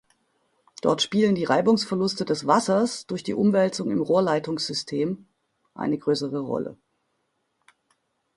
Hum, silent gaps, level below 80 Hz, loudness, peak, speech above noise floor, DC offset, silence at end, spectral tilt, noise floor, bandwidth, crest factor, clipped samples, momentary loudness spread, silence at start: none; none; -66 dBFS; -24 LUFS; -4 dBFS; 51 dB; under 0.1%; 1.6 s; -5 dB/octave; -74 dBFS; 11.5 kHz; 20 dB; under 0.1%; 9 LU; 0.85 s